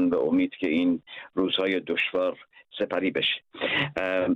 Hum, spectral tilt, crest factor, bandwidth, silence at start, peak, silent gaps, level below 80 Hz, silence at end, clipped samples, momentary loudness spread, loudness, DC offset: none; -6.5 dB/octave; 12 dB; 5.8 kHz; 0 s; -14 dBFS; none; -64 dBFS; 0 s; under 0.1%; 8 LU; -26 LUFS; under 0.1%